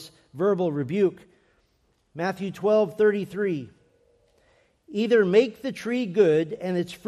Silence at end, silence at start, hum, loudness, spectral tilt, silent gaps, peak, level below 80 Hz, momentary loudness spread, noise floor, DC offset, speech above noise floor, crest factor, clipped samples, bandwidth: 0.1 s; 0 s; none; -24 LUFS; -7 dB/octave; none; -6 dBFS; -68 dBFS; 10 LU; -68 dBFS; under 0.1%; 44 dB; 18 dB; under 0.1%; 13 kHz